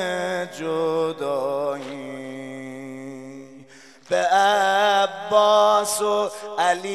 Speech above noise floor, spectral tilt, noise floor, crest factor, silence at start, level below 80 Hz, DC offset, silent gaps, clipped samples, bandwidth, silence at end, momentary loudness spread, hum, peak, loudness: 26 dB; -2.5 dB/octave; -48 dBFS; 18 dB; 0 s; -74 dBFS; 0.1%; none; under 0.1%; 14.5 kHz; 0 s; 18 LU; none; -4 dBFS; -21 LUFS